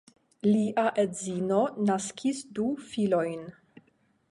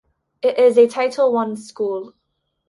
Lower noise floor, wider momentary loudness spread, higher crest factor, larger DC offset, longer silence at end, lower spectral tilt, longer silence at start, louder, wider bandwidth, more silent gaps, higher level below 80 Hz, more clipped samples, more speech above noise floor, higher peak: second, -68 dBFS vs -73 dBFS; second, 7 LU vs 12 LU; about the same, 16 dB vs 16 dB; neither; first, 0.8 s vs 0.6 s; about the same, -5.5 dB/octave vs -5 dB/octave; about the same, 0.45 s vs 0.45 s; second, -28 LUFS vs -18 LUFS; about the same, 11.5 kHz vs 11.5 kHz; neither; about the same, -70 dBFS vs -70 dBFS; neither; second, 40 dB vs 56 dB; second, -12 dBFS vs -2 dBFS